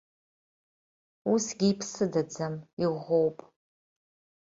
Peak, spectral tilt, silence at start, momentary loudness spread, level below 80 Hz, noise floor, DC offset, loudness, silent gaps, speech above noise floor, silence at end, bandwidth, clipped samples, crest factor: -14 dBFS; -5.5 dB/octave; 1.25 s; 8 LU; -70 dBFS; under -90 dBFS; under 0.1%; -29 LUFS; 2.73-2.77 s; over 62 dB; 1.15 s; 7.8 kHz; under 0.1%; 18 dB